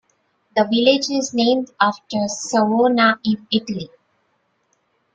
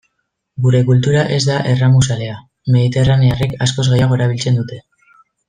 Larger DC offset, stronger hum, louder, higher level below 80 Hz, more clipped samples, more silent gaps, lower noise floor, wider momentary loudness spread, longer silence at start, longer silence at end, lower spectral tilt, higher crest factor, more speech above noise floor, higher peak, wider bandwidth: neither; neither; second, -18 LUFS vs -14 LUFS; second, -62 dBFS vs -40 dBFS; neither; neither; about the same, -67 dBFS vs -70 dBFS; second, 9 LU vs 12 LU; about the same, 0.55 s vs 0.6 s; first, 1.3 s vs 0.7 s; second, -4 dB/octave vs -6 dB/octave; first, 18 dB vs 12 dB; second, 48 dB vs 57 dB; about the same, -2 dBFS vs -2 dBFS; about the same, 9 kHz vs 9.6 kHz